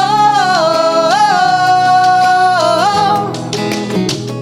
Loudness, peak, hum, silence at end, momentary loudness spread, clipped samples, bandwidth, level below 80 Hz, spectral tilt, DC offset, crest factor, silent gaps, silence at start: -11 LUFS; -2 dBFS; none; 0 s; 8 LU; under 0.1%; 15.5 kHz; -52 dBFS; -4 dB/octave; under 0.1%; 10 dB; none; 0 s